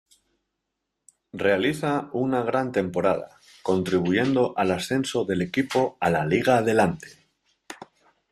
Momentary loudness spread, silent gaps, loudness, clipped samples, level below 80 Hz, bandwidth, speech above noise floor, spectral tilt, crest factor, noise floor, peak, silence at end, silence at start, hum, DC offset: 16 LU; none; -24 LUFS; under 0.1%; -60 dBFS; 14.5 kHz; 58 dB; -6 dB/octave; 18 dB; -81 dBFS; -6 dBFS; 0.45 s; 1.35 s; none; under 0.1%